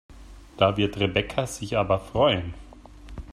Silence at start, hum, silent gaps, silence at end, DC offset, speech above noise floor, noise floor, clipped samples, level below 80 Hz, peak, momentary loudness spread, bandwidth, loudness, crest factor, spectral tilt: 0.1 s; none; none; 0 s; under 0.1%; 21 dB; -45 dBFS; under 0.1%; -44 dBFS; -6 dBFS; 19 LU; 13.5 kHz; -24 LUFS; 20 dB; -5.5 dB/octave